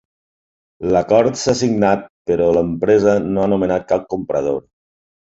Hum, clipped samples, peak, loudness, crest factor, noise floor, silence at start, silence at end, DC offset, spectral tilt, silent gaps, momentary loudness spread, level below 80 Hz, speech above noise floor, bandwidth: none; under 0.1%; -2 dBFS; -17 LUFS; 16 dB; under -90 dBFS; 0.8 s; 0.8 s; under 0.1%; -6 dB/octave; 2.10-2.25 s; 8 LU; -46 dBFS; over 74 dB; 8 kHz